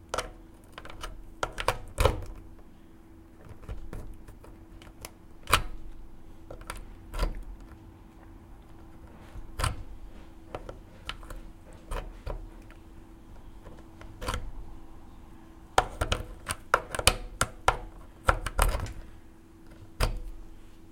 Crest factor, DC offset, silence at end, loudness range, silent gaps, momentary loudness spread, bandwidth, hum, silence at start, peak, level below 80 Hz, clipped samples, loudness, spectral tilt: 34 dB; under 0.1%; 0 s; 14 LU; none; 24 LU; 16.5 kHz; none; 0 s; 0 dBFS; -40 dBFS; under 0.1%; -32 LUFS; -3 dB/octave